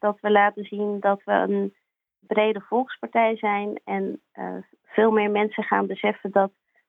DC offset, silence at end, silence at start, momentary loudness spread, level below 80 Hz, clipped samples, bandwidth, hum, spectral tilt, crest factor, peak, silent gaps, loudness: under 0.1%; 0.4 s; 0.05 s; 12 LU; -76 dBFS; under 0.1%; 3.9 kHz; none; -8.5 dB/octave; 18 dB; -6 dBFS; none; -23 LUFS